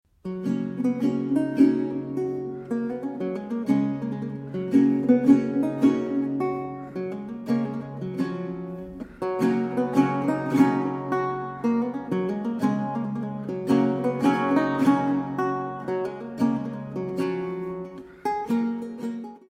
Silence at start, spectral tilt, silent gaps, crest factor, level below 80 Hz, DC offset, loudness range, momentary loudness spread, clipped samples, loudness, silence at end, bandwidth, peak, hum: 0.25 s; -8 dB/octave; none; 18 dB; -62 dBFS; under 0.1%; 6 LU; 12 LU; under 0.1%; -25 LUFS; 0.1 s; 11 kHz; -6 dBFS; none